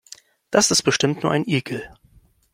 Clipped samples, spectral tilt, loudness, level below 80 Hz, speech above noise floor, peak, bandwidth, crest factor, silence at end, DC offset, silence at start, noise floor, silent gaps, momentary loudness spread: under 0.1%; -3.5 dB/octave; -19 LUFS; -56 dBFS; 35 dB; -2 dBFS; 16.5 kHz; 20 dB; 0.65 s; under 0.1%; 0.5 s; -55 dBFS; none; 11 LU